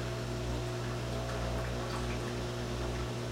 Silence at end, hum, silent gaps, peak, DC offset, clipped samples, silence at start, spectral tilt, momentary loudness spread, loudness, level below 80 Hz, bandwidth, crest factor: 0 s; 60 Hz at -40 dBFS; none; -24 dBFS; under 0.1%; under 0.1%; 0 s; -5.5 dB/octave; 1 LU; -37 LUFS; -42 dBFS; 16 kHz; 12 dB